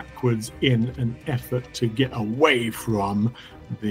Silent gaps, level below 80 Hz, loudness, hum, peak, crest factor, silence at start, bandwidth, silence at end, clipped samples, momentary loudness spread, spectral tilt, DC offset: none; -48 dBFS; -24 LUFS; none; -4 dBFS; 20 dB; 0 s; 16 kHz; 0 s; under 0.1%; 10 LU; -6 dB/octave; under 0.1%